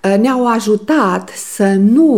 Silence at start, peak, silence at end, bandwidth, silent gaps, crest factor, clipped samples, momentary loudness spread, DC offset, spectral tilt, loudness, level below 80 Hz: 0.05 s; -2 dBFS; 0 s; 15.5 kHz; none; 10 dB; under 0.1%; 7 LU; 0.3%; -6 dB/octave; -13 LUFS; -64 dBFS